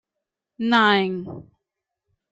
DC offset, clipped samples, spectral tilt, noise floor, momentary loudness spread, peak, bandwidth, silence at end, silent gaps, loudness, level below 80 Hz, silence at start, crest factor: under 0.1%; under 0.1%; -6 dB/octave; -84 dBFS; 21 LU; -6 dBFS; 8 kHz; 0.9 s; none; -19 LUFS; -66 dBFS; 0.6 s; 18 dB